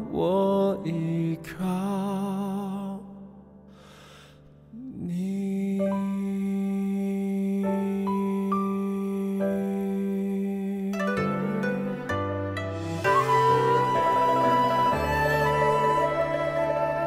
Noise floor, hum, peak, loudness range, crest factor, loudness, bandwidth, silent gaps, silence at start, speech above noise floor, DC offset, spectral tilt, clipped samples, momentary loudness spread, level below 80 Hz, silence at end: -51 dBFS; none; -10 dBFS; 10 LU; 16 dB; -26 LUFS; 15.5 kHz; none; 0 s; 25 dB; under 0.1%; -7 dB/octave; under 0.1%; 9 LU; -52 dBFS; 0 s